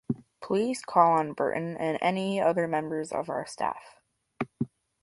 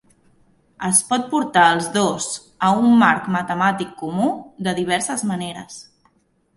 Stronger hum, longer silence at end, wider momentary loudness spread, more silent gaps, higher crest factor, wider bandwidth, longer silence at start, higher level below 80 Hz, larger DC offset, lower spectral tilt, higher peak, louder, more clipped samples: neither; second, 0.35 s vs 0.75 s; about the same, 13 LU vs 13 LU; neither; about the same, 20 dB vs 20 dB; about the same, 11.5 kHz vs 11.5 kHz; second, 0.1 s vs 0.8 s; second, -68 dBFS vs -60 dBFS; neither; first, -6 dB/octave vs -3.5 dB/octave; second, -8 dBFS vs 0 dBFS; second, -28 LUFS vs -19 LUFS; neither